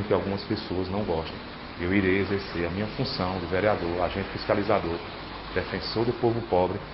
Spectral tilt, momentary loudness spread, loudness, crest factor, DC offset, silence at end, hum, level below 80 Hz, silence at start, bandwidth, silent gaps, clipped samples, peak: -10.5 dB/octave; 8 LU; -28 LUFS; 20 dB; under 0.1%; 0 s; none; -44 dBFS; 0 s; 5.8 kHz; none; under 0.1%; -8 dBFS